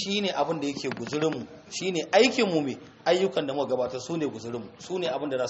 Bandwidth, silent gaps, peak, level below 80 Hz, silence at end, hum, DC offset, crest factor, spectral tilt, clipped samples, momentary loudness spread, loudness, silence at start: 8 kHz; none; -6 dBFS; -68 dBFS; 0 s; none; under 0.1%; 20 dB; -3 dB/octave; under 0.1%; 13 LU; -27 LUFS; 0 s